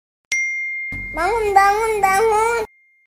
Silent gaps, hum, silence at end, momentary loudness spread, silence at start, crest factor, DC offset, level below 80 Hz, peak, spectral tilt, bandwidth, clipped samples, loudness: none; none; 0.4 s; 10 LU; 0.3 s; 18 dB; under 0.1%; -42 dBFS; 0 dBFS; -2.5 dB/octave; 16 kHz; under 0.1%; -18 LUFS